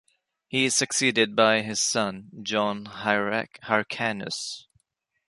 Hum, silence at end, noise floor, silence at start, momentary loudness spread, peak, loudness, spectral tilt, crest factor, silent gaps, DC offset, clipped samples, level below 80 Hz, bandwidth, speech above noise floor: none; 0.7 s; -76 dBFS; 0.5 s; 10 LU; -4 dBFS; -24 LUFS; -2.5 dB/octave; 22 dB; none; under 0.1%; under 0.1%; -68 dBFS; 11.5 kHz; 51 dB